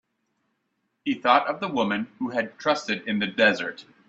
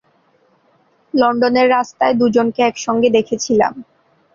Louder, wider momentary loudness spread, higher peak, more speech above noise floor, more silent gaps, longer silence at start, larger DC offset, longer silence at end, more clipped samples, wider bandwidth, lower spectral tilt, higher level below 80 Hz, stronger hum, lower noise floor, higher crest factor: second, -24 LUFS vs -15 LUFS; first, 9 LU vs 4 LU; about the same, -4 dBFS vs -2 dBFS; first, 51 dB vs 43 dB; neither; about the same, 1.05 s vs 1.15 s; neither; second, 0.25 s vs 0.5 s; neither; about the same, 8 kHz vs 7.4 kHz; about the same, -4.5 dB/octave vs -4.5 dB/octave; second, -70 dBFS vs -56 dBFS; neither; first, -76 dBFS vs -57 dBFS; first, 24 dB vs 14 dB